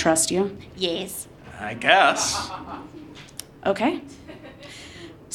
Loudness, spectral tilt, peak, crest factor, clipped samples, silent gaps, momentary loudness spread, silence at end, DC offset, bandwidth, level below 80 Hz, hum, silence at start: -22 LUFS; -2.5 dB/octave; -2 dBFS; 24 dB; under 0.1%; none; 24 LU; 0 s; under 0.1%; 18 kHz; -54 dBFS; none; 0 s